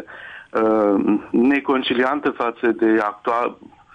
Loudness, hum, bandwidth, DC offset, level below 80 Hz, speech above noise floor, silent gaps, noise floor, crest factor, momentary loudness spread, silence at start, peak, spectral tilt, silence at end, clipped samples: -19 LUFS; none; 6.6 kHz; under 0.1%; -60 dBFS; 20 dB; none; -39 dBFS; 12 dB; 8 LU; 0 s; -8 dBFS; -7 dB/octave; 0.4 s; under 0.1%